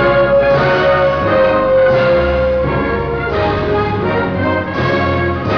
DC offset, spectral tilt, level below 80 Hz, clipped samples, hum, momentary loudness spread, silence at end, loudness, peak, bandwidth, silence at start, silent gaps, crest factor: 0.5%; -8 dB/octave; -30 dBFS; under 0.1%; none; 5 LU; 0 s; -13 LUFS; -2 dBFS; 5.4 kHz; 0 s; none; 12 dB